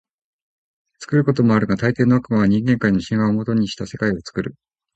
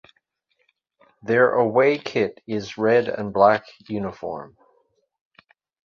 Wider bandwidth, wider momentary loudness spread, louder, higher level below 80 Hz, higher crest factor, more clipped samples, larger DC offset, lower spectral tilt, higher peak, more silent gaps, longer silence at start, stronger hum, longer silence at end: first, 8.2 kHz vs 7 kHz; second, 9 LU vs 15 LU; about the same, -19 LUFS vs -21 LUFS; first, -48 dBFS vs -62 dBFS; about the same, 16 dB vs 20 dB; neither; neither; about the same, -7.5 dB/octave vs -6.5 dB/octave; about the same, -2 dBFS vs -2 dBFS; neither; second, 1 s vs 1.25 s; neither; second, 0.45 s vs 1.4 s